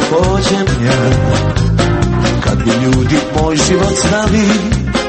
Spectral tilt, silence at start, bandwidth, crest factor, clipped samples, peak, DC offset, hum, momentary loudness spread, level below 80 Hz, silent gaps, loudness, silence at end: -5.5 dB/octave; 0 s; 8.8 kHz; 12 dB; under 0.1%; 0 dBFS; under 0.1%; none; 2 LU; -22 dBFS; none; -12 LUFS; 0 s